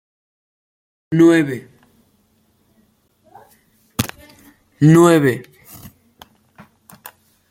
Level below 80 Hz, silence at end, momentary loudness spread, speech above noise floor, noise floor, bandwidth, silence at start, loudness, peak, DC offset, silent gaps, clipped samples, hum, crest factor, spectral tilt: -56 dBFS; 2.1 s; 18 LU; 48 dB; -60 dBFS; 16.5 kHz; 1.1 s; -15 LUFS; 0 dBFS; under 0.1%; none; under 0.1%; none; 20 dB; -6.5 dB/octave